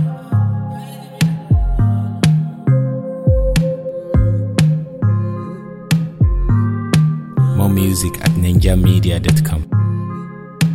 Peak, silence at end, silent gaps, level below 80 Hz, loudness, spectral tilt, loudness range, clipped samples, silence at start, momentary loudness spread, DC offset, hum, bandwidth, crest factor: 0 dBFS; 0 s; none; -24 dBFS; -16 LUFS; -6.5 dB/octave; 3 LU; under 0.1%; 0 s; 10 LU; under 0.1%; none; 16.5 kHz; 14 dB